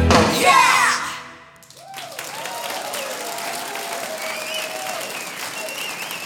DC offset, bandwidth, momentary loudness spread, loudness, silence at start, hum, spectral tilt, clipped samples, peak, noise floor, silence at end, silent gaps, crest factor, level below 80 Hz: under 0.1%; 19 kHz; 17 LU; -21 LUFS; 0 s; none; -3 dB/octave; under 0.1%; 0 dBFS; -44 dBFS; 0 s; none; 22 dB; -40 dBFS